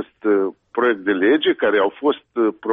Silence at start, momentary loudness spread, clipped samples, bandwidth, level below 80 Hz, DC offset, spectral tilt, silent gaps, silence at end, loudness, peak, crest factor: 0 s; 5 LU; under 0.1%; 3.9 kHz; -64 dBFS; under 0.1%; -7.5 dB/octave; none; 0 s; -19 LUFS; -6 dBFS; 12 dB